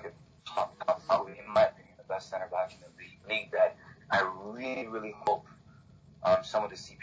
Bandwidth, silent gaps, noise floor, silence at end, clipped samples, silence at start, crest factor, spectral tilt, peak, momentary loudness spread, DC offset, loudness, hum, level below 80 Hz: 8 kHz; none; -57 dBFS; 0 s; under 0.1%; 0 s; 18 dB; -4.5 dB/octave; -14 dBFS; 12 LU; under 0.1%; -32 LUFS; none; -66 dBFS